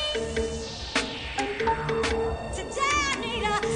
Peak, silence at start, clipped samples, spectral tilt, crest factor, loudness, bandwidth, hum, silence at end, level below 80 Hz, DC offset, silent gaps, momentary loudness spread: -10 dBFS; 0 s; under 0.1%; -3.5 dB/octave; 18 dB; -27 LUFS; 10.5 kHz; none; 0 s; -42 dBFS; under 0.1%; none; 7 LU